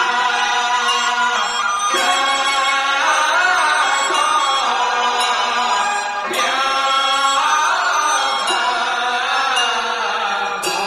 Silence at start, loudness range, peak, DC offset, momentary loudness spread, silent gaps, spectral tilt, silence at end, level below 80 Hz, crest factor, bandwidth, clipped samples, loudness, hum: 0 s; 1 LU; -4 dBFS; under 0.1%; 4 LU; none; 1 dB/octave; 0 s; -60 dBFS; 12 dB; 15.5 kHz; under 0.1%; -16 LUFS; none